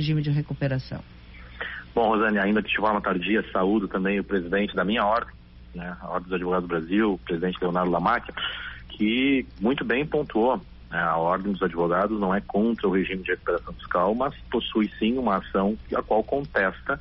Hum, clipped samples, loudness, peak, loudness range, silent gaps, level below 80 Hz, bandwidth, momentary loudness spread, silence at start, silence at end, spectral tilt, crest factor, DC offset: none; under 0.1%; -25 LUFS; -10 dBFS; 2 LU; none; -46 dBFS; 5.8 kHz; 8 LU; 0 s; 0 s; -4.5 dB/octave; 14 dB; under 0.1%